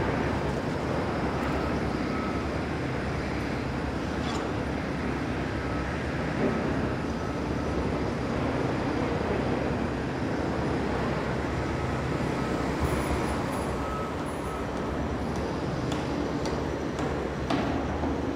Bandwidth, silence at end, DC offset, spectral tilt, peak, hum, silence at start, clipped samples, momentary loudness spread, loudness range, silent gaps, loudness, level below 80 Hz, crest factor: 16 kHz; 0 s; under 0.1%; -6.5 dB/octave; -14 dBFS; none; 0 s; under 0.1%; 3 LU; 2 LU; none; -30 LUFS; -40 dBFS; 14 dB